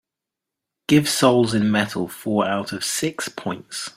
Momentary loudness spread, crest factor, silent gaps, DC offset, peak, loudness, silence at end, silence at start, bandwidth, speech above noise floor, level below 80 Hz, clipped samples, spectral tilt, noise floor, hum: 12 LU; 18 dB; none; under 0.1%; -2 dBFS; -21 LUFS; 0.05 s; 0.9 s; 16 kHz; 65 dB; -58 dBFS; under 0.1%; -4.5 dB/octave; -85 dBFS; none